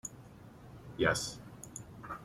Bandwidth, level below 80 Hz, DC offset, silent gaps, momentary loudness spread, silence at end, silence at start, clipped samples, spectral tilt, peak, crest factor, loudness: 16 kHz; -60 dBFS; under 0.1%; none; 23 LU; 0 s; 0.05 s; under 0.1%; -3.5 dB/octave; -16 dBFS; 24 dB; -36 LUFS